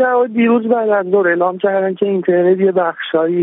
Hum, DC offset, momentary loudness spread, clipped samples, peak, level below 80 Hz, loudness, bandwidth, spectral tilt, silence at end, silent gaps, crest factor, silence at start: none; under 0.1%; 4 LU; under 0.1%; -2 dBFS; -68 dBFS; -14 LUFS; 3.9 kHz; -5 dB/octave; 0 s; none; 12 dB; 0 s